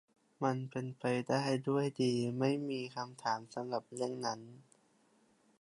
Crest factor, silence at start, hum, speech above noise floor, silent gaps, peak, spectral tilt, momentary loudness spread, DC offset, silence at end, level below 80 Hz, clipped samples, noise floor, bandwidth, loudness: 20 dB; 0.4 s; none; 35 dB; none; -18 dBFS; -6 dB/octave; 7 LU; under 0.1%; 1 s; -82 dBFS; under 0.1%; -71 dBFS; 11.5 kHz; -37 LUFS